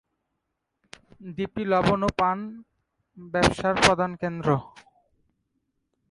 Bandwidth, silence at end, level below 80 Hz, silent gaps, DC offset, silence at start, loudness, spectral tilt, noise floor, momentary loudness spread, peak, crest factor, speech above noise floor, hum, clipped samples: 11.5 kHz; 1.45 s; -48 dBFS; none; under 0.1%; 1.2 s; -24 LUFS; -5 dB/octave; -80 dBFS; 13 LU; -4 dBFS; 24 dB; 56 dB; none; under 0.1%